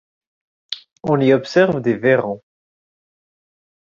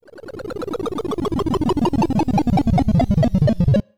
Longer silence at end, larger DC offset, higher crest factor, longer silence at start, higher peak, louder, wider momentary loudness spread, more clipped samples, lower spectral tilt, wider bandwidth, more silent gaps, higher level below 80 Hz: first, 1.6 s vs 0 s; second, under 0.1% vs 2%; first, 18 dB vs 12 dB; first, 0.7 s vs 0 s; first, -2 dBFS vs -6 dBFS; about the same, -17 LUFS vs -19 LUFS; first, 16 LU vs 12 LU; neither; second, -7 dB/octave vs -8.5 dB/octave; second, 7.4 kHz vs 14 kHz; first, 0.92-0.96 s vs none; second, -60 dBFS vs -32 dBFS